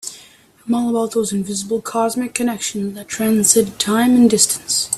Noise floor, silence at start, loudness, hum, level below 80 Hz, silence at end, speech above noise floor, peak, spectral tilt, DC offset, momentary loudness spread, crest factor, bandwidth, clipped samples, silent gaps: -47 dBFS; 0.05 s; -17 LUFS; none; -56 dBFS; 0 s; 30 dB; 0 dBFS; -3 dB/octave; under 0.1%; 10 LU; 18 dB; 14.5 kHz; under 0.1%; none